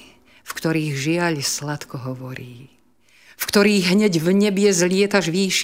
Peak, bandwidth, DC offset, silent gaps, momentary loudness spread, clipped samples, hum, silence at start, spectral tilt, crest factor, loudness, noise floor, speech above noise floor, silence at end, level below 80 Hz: -4 dBFS; 16 kHz; 0.1%; none; 15 LU; under 0.1%; none; 0.45 s; -4.5 dB/octave; 18 dB; -19 LUFS; -56 dBFS; 37 dB; 0 s; -60 dBFS